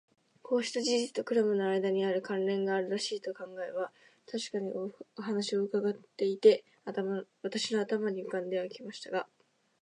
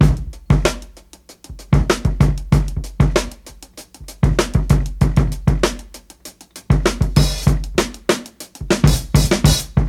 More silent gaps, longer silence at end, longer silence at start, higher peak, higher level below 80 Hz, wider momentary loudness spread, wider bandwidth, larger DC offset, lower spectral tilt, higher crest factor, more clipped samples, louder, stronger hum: neither; first, 0.55 s vs 0 s; first, 0.45 s vs 0 s; second, -10 dBFS vs 0 dBFS; second, -88 dBFS vs -22 dBFS; second, 11 LU vs 22 LU; second, 10.5 kHz vs 16.5 kHz; neither; about the same, -4.5 dB/octave vs -5.5 dB/octave; about the same, 22 dB vs 18 dB; neither; second, -33 LUFS vs -18 LUFS; neither